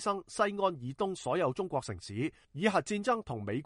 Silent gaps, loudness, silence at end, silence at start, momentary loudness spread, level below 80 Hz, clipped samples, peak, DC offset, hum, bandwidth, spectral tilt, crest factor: none; -33 LUFS; 0 s; 0 s; 7 LU; -64 dBFS; under 0.1%; -12 dBFS; under 0.1%; none; 11.5 kHz; -5.5 dB/octave; 22 dB